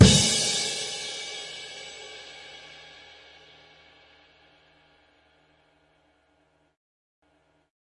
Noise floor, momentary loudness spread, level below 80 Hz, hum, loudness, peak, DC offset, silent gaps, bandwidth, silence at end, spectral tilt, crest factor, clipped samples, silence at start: -67 dBFS; 27 LU; -44 dBFS; none; -25 LUFS; 0 dBFS; under 0.1%; none; 11.5 kHz; 5.3 s; -3.5 dB/octave; 28 dB; under 0.1%; 0 s